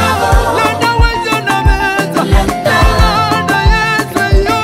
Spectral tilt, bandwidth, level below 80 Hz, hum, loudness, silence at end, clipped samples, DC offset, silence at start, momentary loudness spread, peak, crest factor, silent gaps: -5 dB/octave; 16 kHz; -16 dBFS; none; -11 LUFS; 0 s; under 0.1%; under 0.1%; 0 s; 3 LU; 0 dBFS; 10 dB; none